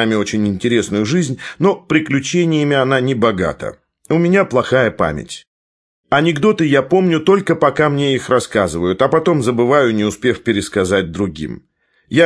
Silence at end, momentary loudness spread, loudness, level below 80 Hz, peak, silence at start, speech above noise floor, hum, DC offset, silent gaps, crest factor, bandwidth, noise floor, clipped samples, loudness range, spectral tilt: 0 s; 8 LU; -15 LUFS; -46 dBFS; 0 dBFS; 0 s; over 75 dB; none; under 0.1%; 5.47-6.04 s; 16 dB; 11 kHz; under -90 dBFS; under 0.1%; 2 LU; -5.5 dB/octave